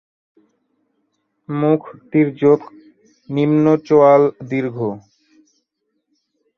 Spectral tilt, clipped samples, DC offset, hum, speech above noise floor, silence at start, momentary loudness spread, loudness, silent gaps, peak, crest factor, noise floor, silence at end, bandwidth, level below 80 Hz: -9.5 dB/octave; under 0.1%; under 0.1%; none; 57 dB; 1.5 s; 14 LU; -16 LUFS; none; -2 dBFS; 16 dB; -72 dBFS; 1.6 s; 6.6 kHz; -62 dBFS